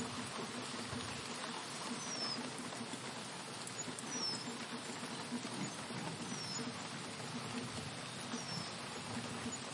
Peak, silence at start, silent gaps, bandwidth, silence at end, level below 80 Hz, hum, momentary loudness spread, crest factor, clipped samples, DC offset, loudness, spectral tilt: -28 dBFS; 0 s; none; 11.5 kHz; 0 s; -78 dBFS; none; 5 LU; 16 dB; under 0.1%; under 0.1%; -43 LUFS; -3 dB/octave